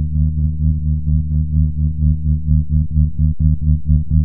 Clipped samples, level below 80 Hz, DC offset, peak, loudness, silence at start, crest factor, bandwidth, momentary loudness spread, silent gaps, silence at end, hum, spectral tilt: under 0.1%; -18 dBFS; 0.7%; -2 dBFS; -17 LUFS; 0 s; 14 dB; 0.7 kHz; 2 LU; none; 0 s; none; -16 dB/octave